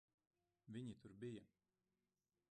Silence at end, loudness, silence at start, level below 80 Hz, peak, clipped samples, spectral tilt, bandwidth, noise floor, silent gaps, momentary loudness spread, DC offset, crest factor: 1.05 s; -56 LUFS; 0.65 s; -86 dBFS; -42 dBFS; under 0.1%; -7 dB/octave; 9.4 kHz; under -90 dBFS; none; 4 LU; under 0.1%; 18 dB